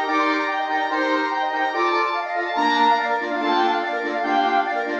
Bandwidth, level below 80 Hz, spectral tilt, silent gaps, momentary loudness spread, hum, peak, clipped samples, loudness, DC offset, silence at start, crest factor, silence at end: 8.2 kHz; -74 dBFS; -2.5 dB/octave; none; 5 LU; none; -8 dBFS; under 0.1%; -21 LUFS; under 0.1%; 0 s; 14 dB; 0 s